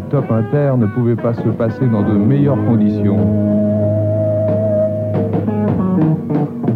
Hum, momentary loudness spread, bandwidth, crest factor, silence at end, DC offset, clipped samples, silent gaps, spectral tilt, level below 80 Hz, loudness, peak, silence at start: none; 4 LU; 4.4 kHz; 10 dB; 0 s; under 0.1%; under 0.1%; none; -11.5 dB/octave; -46 dBFS; -15 LUFS; -4 dBFS; 0 s